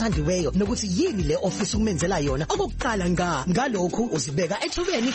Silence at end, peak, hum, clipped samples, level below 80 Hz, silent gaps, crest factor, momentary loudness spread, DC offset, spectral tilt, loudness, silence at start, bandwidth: 0 s; -12 dBFS; none; under 0.1%; -36 dBFS; none; 12 dB; 2 LU; under 0.1%; -5 dB/octave; -24 LUFS; 0 s; 8.8 kHz